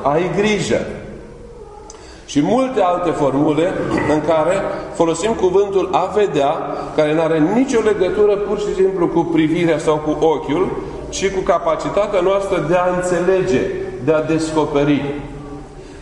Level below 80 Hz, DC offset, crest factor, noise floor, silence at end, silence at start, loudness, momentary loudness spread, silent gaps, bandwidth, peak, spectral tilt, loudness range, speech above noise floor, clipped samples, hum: -40 dBFS; under 0.1%; 16 dB; -37 dBFS; 0 s; 0 s; -17 LUFS; 14 LU; none; 11 kHz; 0 dBFS; -6 dB/octave; 2 LU; 21 dB; under 0.1%; none